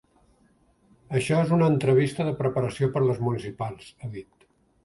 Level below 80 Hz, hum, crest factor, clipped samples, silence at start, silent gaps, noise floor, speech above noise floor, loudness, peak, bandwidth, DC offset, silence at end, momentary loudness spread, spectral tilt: -58 dBFS; none; 18 dB; under 0.1%; 1.1 s; none; -63 dBFS; 39 dB; -25 LUFS; -8 dBFS; 11.5 kHz; under 0.1%; 0.65 s; 17 LU; -7.5 dB/octave